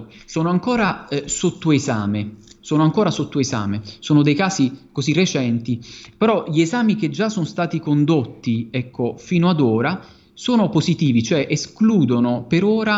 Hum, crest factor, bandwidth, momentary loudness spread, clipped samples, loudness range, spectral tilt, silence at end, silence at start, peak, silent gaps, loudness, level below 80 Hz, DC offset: none; 16 dB; 8 kHz; 9 LU; under 0.1%; 2 LU; -6 dB/octave; 0 s; 0 s; -4 dBFS; none; -19 LUFS; -54 dBFS; under 0.1%